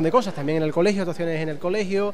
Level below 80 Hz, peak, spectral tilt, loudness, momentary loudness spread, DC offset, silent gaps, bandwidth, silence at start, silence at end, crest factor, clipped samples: -62 dBFS; -6 dBFS; -6.5 dB/octave; -24 LUFS; 5 LU; 2%; none; 14 kHz; 0 s; 0 s; 16 dB; under 0.1%